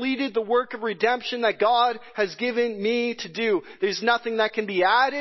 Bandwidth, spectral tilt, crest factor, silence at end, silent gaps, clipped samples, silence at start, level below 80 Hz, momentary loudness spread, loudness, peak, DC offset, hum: 6.2 kHz; -4 dB/octave; 18 dB; 0 s; none; under 0.1%; 0 s; -72 dBFS; 7 LU; -24 LUFS; -6 dBFS; under 0.1%; none